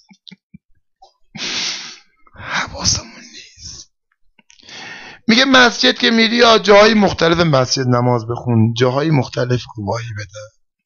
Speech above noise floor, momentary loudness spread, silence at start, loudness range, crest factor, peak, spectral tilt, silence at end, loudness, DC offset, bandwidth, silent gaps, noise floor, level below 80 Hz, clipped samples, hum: 44 dB; 24 LU; 1.35 s; 11 LU; 14 dB; -2 dBFS; -4 dB/octave; 0.4 s; -14 LUFS; under 0.1%; 7.6 kHz; none; -58 dBFS; -44 dBFS; under 0.1%; none